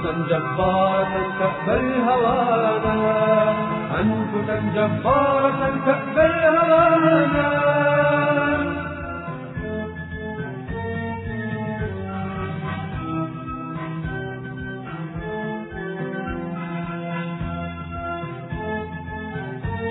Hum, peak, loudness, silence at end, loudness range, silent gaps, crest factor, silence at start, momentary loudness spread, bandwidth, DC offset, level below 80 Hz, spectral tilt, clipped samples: none; -4 dBFS; -22 LUFS; 0 s; 12 LU; none; 18 dB; 0 s; 13 LU; 4.1 kHz; under 0.1%; -44 dBFS; -11 dB/octave; under 0.1%